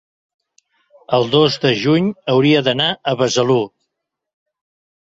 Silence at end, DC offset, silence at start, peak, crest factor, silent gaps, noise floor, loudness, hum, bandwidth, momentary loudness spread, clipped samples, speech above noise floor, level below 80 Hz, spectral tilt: 1.45 s; under 0.1%; 1.1 s; -2 dBFS; 16 dB; none; -77 dBFS; -15 LUFS; none; 7.8 kHz; 5 LU; under 0.1%; 62 dB; -58 dBFS; -5 dB/octave